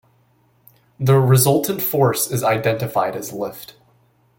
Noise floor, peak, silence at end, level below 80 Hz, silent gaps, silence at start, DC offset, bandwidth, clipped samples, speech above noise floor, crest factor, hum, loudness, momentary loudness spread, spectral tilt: -59 dBFS; -2 dBFS; 0.75 s; -54 dBFS; none; 1 s; under 0.1%; 17 kHz; under 0.1%; 41 dB; 18 dB; none; -18 LUFS; 14 LU; -5.5 dB/octave